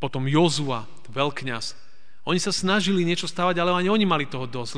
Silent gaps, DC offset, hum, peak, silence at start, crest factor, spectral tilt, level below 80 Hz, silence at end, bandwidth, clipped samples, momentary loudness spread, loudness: none; 2%; none; -8 dBFS; 0 s; 18 dB; -4.5 dB/octave; -64 dBFS; 0 s; 10 kHz; under 0.1%; 11 LU; -23 LUFS